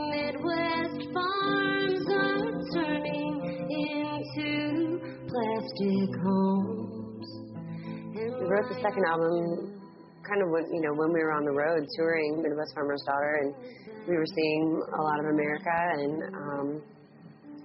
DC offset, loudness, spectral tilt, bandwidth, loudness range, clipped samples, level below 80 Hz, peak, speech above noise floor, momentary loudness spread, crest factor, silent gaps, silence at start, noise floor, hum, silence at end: under 0.1%; -29 LUFS; -4.5 dB/octave; 5.8 kHz; 2 LU; under 0.1%; -68 dBFS; -14 dBFS; 23 dB; 12 LU; 16 dB; none; 0 s; -52 dBFS; none; 0 s